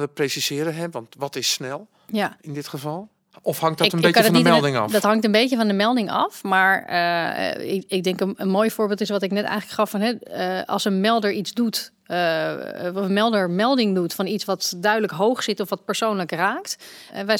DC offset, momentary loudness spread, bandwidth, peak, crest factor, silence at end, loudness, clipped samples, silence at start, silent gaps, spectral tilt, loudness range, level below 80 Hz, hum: under 0.1%; 12 LU; 19 kHz; 0 dBFS; 22 dB; 0 s; -21 LUFS; under 0.1%; 0 s; none; -4.5 dB/octave; 5 LU; -72 dBFS; none